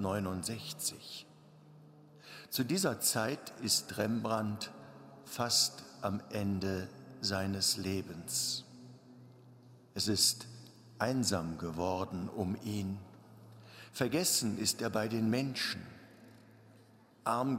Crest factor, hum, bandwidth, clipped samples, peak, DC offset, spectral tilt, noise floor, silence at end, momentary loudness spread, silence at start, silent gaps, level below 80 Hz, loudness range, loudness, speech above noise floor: 22 dB; none; 16 kHz; under 0.1%; -14 dBFS; under 0.1%; -3.5 dB/octave; -62 dBFS; 0 s; 18 LU; 0 s; none; -70 dBFS; 3 LU; -34 LUFS; 27 dB